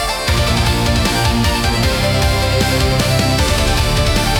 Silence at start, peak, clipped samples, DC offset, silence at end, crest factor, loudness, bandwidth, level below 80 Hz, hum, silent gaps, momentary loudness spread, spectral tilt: 0 s; -4 dBFS; under 0.1%; under 0.1%; 0 s; 10 dB; -14 LUFS; over 20 kHz; -20 dBFS; none; none; 1 LU; -4.5 dB/octave